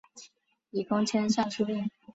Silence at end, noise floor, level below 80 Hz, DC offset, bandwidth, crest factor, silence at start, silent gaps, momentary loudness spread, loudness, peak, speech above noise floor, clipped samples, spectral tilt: 0.05 s; -62 dBFS; -70 dBFS; under 0.1%; 8 kHz; 18 dB; 0.15 s; none; 8 LU; -30 LUFS; -12 dBFS; 33 dB; under 0.1%; -5 dB/octave